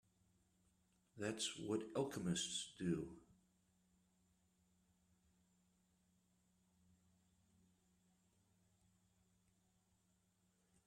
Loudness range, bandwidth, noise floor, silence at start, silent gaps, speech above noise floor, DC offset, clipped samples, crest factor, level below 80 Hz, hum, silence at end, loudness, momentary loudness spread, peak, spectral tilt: 7 LU; 14 kHz; -81 dBFS; 1.15 s; none; 36 dB; under 0.1%; under 0.1%; 24 dB; -80 dBFS; none; 7.65 s; -44 LUFS; 5 LU; -28 dBFS; -4 dB/octave